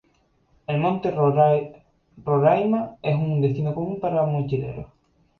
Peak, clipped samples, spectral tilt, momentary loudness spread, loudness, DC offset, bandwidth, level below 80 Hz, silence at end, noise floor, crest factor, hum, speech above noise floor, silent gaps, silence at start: -6 dBFS; under 0.1%; -10.5 dB/octave; 14 LU; -22 LUFS; under 0.1%; 4.5 kHz; -54 dBFS; 0.55 s; -64 dBFS; 18 dB; none; 42 dB; none; 0.7 s